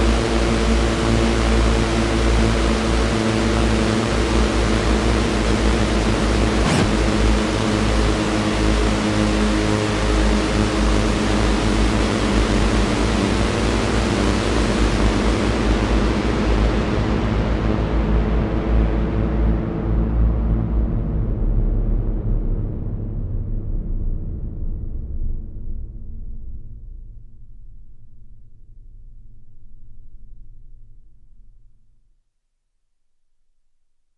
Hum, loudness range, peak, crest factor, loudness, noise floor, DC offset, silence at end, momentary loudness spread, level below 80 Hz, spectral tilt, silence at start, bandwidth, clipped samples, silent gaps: none; 12 LU; -4 dBFS; 14 dB; -20 LUFS; -69 dBFS; under 0.1%; 2.9 s; 11 LU; -22 dBFS; -5.5 dB/octave; 0 s; 11.5 kHz; under 0.1%; none